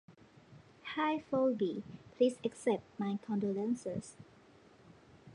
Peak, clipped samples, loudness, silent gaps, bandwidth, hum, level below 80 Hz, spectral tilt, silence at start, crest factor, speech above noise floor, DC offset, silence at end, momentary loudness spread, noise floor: -18 dBFS; under 0.1%; -36 LUFS; none; 11 kHz; none; -74 dBFS; -6 dB/octave; 0.1 s; 20 dB; 27 dB; under 0.1%; 0 s; 12 LU; -62 dBFS